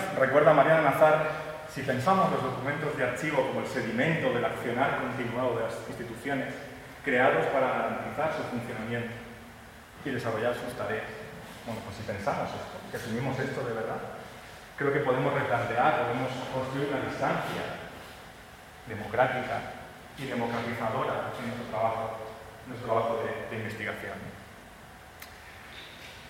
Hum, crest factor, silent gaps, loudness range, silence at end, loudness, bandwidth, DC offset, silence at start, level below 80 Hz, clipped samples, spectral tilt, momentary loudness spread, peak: none; 22 dB; none; 6 LU; 0 s; -29 LUFS; 16.5 kHz; under 0.1%; 0 s; -60 dBFS; under 0.1%; -6 dB/octave; 20 LU; -8 dBFS